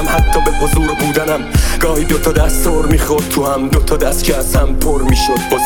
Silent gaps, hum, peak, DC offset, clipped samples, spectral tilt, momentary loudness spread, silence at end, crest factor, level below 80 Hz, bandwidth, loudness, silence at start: none; none; 0 dBFS; under 0.1%; under 0.1%; -4.5 dB/octave; 2 LU; 0 s; 12 dB; -16 dBFS; 19 kHz; -14 LUFS; 0 s